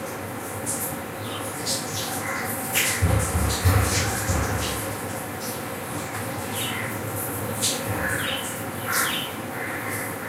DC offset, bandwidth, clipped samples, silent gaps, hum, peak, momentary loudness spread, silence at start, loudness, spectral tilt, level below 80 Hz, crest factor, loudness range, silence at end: under 0.1%; 16 kHz; under 0.1%; none; none; -8 dBFS; 9 LU; 0 s; -26 LUFS; -3.5 dB/octave; -38 dBFS; 20 dB; 4 LU; 0 s